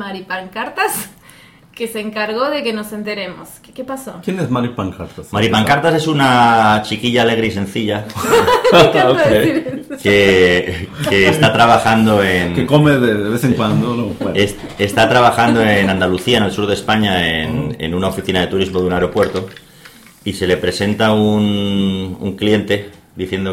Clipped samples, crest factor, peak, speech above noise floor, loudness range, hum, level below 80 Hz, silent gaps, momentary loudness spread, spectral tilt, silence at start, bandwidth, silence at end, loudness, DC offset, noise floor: under 0.1%; 14 dB; 0 dBFS; 29 dB; 9 LU; none; -42 dBFS; none; 14 LU; -5.5 dB/octave; 0 s; 17 kHz; 0 s; -14 LUFS; under 0.1%; -43 dBFS